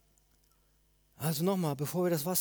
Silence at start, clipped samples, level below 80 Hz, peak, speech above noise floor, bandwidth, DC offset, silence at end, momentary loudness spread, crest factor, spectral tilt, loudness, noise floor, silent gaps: 1.2 s; under 0.1%; -70 dBFS; -16 dBFS; 38 dB; over 20 kHz; under 0.1%; 0 s; 5 LU; 18 dB; -5.5 dB/octave; -32 LUFS; -69 dBFS; none